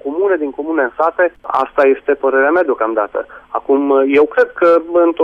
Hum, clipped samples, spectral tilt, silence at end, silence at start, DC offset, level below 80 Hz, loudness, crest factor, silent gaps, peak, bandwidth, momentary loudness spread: none; under 0.1%; -6.5 dB/octave; 0 s; 0.05 s; under 0.1%; -54 dBFS; -14 LUFS; 10 dB; none; -2 dBFS; 5.6 kHz; 7 LU